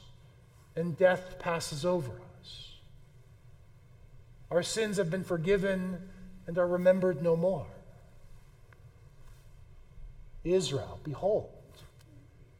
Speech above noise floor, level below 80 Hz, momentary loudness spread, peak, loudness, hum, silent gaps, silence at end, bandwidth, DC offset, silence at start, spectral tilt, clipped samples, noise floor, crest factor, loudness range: 27 dB; -54 dBFS; 20 LU; -12 dBFS; -31 LUFS; none; none; 0.15 s; 15.5 kHz; under 0.1%; 0 s; -5.5 dB/octave; under 0.1%; -57 dBFS; 22 dB; 8 LU